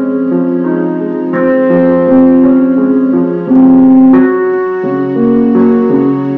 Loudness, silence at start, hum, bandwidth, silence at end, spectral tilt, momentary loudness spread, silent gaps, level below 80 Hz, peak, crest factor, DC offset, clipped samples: -9 LUFS; 0 s; none; 3.3 kHz; 0 s; -11 dB/octave; 8 LU; none; -46 dBFS; 0 dBFS; 8 dB; under 0.1%; under 0.1%